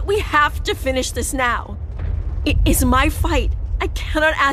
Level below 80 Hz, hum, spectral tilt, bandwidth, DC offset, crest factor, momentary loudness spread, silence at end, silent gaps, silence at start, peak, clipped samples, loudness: -24 dBFS; none; -4.5 dB/octave; 15.5 kHz; under 0.1%; 16 dB; 9 LU; 0 s; none; 0 s; -2 dBFS; under 0.1%; -19 LUFS